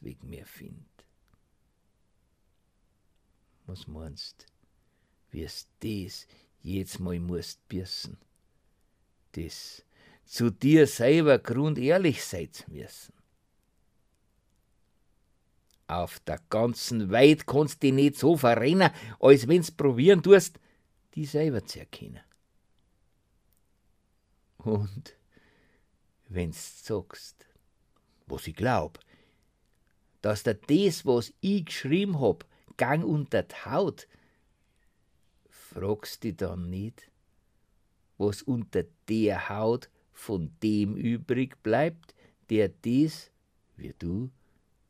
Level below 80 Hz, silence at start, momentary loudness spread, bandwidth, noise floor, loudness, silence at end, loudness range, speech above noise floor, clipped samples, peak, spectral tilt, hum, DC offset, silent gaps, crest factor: -58 dBFS; 0.05 s; 23 LU; 15.5 kHz; -71 dBFS; -26 LUFS; 0.6 s; 18 LU; 44 dB; under 0.1%; -4 dBFS; -6 dB/octave; none; under 0.1%; none; 24 dB